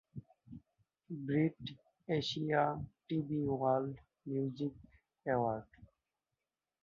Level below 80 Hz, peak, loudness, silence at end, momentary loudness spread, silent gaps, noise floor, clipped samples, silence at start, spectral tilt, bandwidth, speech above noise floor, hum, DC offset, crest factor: -68 dBFS; -18 dBFS; -37 LUFS; 1 s; 20 LU; none; under -90 dBFS; under 0.1%; 0.15 s; -5.5 dB/octave; 6.6 kHz; over 54 dB; none; under 0.1%; 20 dB